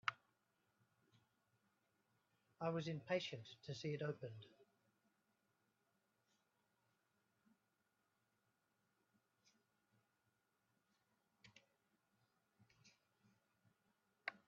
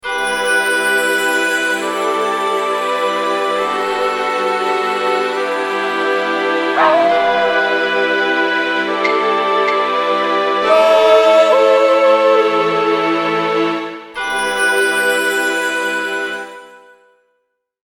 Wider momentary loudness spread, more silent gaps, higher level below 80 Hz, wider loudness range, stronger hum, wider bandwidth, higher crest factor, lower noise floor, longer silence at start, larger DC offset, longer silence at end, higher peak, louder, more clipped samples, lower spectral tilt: first, 12 LU vs 7 LU; neither; second, under -90 dBFS vs -54 dBFS; first, 8 LU vs 5 LU; neither; second, 7.2 kHz vs 18.5 kHz; first, 32 dB vs 14 dB; first, -87 dBFS vs -68 dBFS; about the same, 0.05 s vs 0.05 s; neither; second, 0.1 s vs 1.1 s; second, -24 dBFS vs 0 dBFS; second, -48 LUFS vs -14 LUFS; neither; first, -4 dB/octave vs -2.5 dB/octave